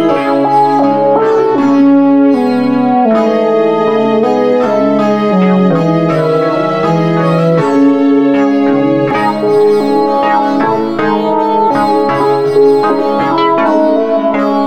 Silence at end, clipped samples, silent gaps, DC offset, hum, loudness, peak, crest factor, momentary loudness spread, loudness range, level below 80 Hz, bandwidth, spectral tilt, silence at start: 0 s; under 0.1%; none; 1%; none; -10 LUFS; 0 dBFS; 10 dB; 3 LU; 1 LU; -52 dBFS; 8.8 kHz; -8 dB/octave; 0 s